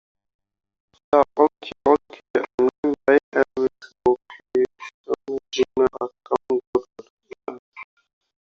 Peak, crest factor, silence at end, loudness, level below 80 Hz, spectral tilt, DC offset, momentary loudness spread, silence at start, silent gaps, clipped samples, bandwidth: -2 dBFS; 20 dB; 0.6 s; -22 LUFS; -58 dBFS; -3 dB/octave; under 0.1%; 18 LU; 1.1 s; 2.30-2.34 s, 2.54-2.58 s, 2.78-2.83 s, 3.23-3.32 s, 4.94-5.04 s, 6.67-6.73 s, 7.10-7.17 s, 7.59-7.72 s; under 0.1%; 7.2 kHz